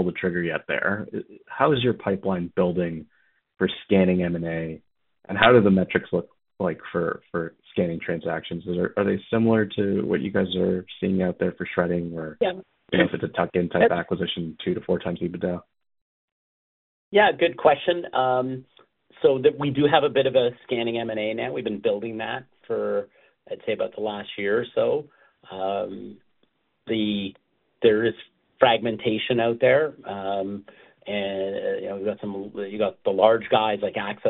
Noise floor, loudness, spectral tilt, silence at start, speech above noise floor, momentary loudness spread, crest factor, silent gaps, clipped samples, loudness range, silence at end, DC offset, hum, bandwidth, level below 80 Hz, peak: -70 dBFS; -24 LUFS; -4.5 dB/octave; 0 s; 46 dB; 12 LU; 24 dB; 16.02-17.11 s; under 0.1%; 6 LU; 0 s; under 0.1%; none; 4.2 kHz; -58 dBFS; 0 dBFS